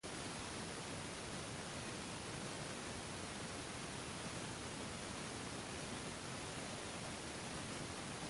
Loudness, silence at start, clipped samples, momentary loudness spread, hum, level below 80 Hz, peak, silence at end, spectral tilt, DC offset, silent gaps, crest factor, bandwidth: -46 LUFS; 0.05 s; under 0.1%; 1 LU; none; -62 dBFS; -32 dBFS; 0 s; -3 dB/octave; under 0.1%; none; 14 dB; 11.5 kHz